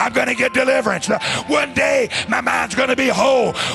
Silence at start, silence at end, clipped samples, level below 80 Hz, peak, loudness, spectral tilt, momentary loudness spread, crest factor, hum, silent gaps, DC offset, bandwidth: 0 s; 0 s; under 0.1%; -48 dBFS; -2 dBFS; -17 LUFS; -3 dB/octave; 4 LU; 14 dB; none; none; under 0.1%; 12.5 kHz